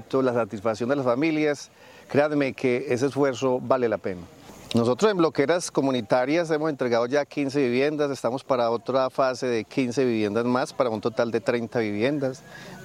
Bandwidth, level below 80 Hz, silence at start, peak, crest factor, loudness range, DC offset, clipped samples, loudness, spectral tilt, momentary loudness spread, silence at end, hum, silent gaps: 15 kHz; -66 dBFS; 0 s; -6 dBFS; 18 dB; 2 LU; under 0.1%; under 0.1%; -24 LUFS; -5.5 dB/octave; 5 LU; 0 s; none; none